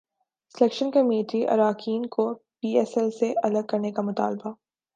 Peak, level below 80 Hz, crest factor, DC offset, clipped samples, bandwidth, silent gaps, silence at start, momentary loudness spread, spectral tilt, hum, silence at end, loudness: -6 dBFS; -78 dBFS; 20 dB; under 0.1%; under 0.1%; 9 kHz; none; 0.55 s; 7 LU; -6.5 dB/octave; none; 0.4 s; -25 LUFS